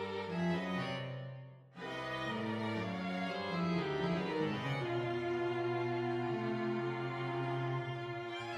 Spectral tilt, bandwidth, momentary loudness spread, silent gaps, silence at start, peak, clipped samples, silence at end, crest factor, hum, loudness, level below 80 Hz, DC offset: -7 dB/octave; 10.5 kHz; 6 LU; none; 0 s; -24 dBFS; under 0.1%; 0 s; 14 dB; none; -38 LUFS; -70 dBFS; under 0.1%